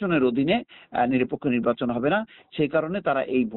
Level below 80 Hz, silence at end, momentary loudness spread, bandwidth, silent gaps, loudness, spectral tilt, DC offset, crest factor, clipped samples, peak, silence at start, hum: -58 dBFS; 0 s; 5 LU; 4.2 kHz; none; -24 LUFS; -5 dB/octave; under 0.1%; 14 dB; under 0.1%; -10 dBFS; 0 s; none